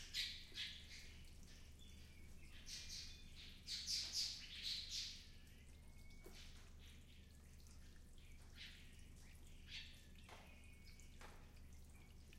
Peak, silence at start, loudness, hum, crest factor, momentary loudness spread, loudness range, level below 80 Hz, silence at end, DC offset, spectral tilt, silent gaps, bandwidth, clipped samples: -32 dBFS; 0 s; -50 LUFS; none; 24 dB; 19 LU; 15 LU; -62 dBFS; 0 s; under 0.1%; -1 dB/octave; none; 16 kHz; under 0.1%